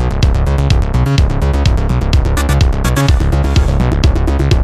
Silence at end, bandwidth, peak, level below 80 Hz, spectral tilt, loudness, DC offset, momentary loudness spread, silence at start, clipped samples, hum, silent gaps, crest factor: 0 s; 14 kHz; 0 dBFS; -14 dBFS; -6 dB/octave; -13 LUFS; under 0.1%; 1 LU; 0 s; under 0.1%; none; none; 10 dB